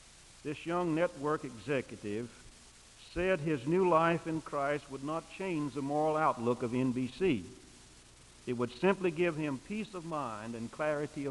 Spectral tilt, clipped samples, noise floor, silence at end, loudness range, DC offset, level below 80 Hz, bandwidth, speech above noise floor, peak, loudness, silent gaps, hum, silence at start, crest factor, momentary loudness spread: -6.5 dB/octave; under 0.1%; -57 dBFS; 0 s; 4 LU; under 0.1%; -62 dBFS; 11.5 kHz; 24 dB; -14 dBFS; -34 LUFS; none; none; 0.05 s; 20 dB; 11 LU